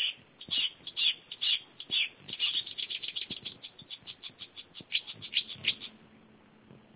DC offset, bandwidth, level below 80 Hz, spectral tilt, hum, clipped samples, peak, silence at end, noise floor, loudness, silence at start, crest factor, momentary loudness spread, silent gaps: under 0.1%; 4 kHz; -74 dBFS; 2 dB/octave; none; under 0.1%; -14 dBFS; 0.15 s; -59 dBFS; -31 LUFS; 0 s; 22 dB; 16 LU; none